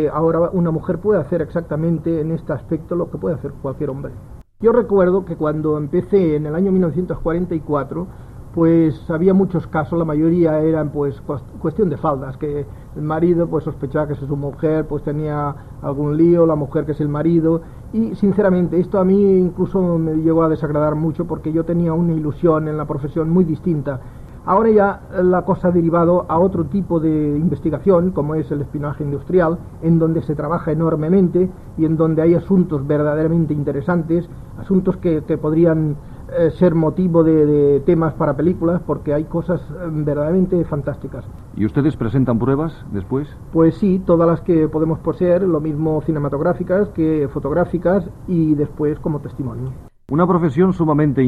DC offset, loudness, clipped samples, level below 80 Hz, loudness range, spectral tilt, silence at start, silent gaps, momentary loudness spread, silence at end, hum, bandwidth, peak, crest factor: under 0.1%; -18 LUFS; under 0.1%; -38 dBFS; 4 LU; -11 dB/octave; 0 s; none; 9 LU; 0 s; none; 4.7 kHz; -2 dBFS; 14 dB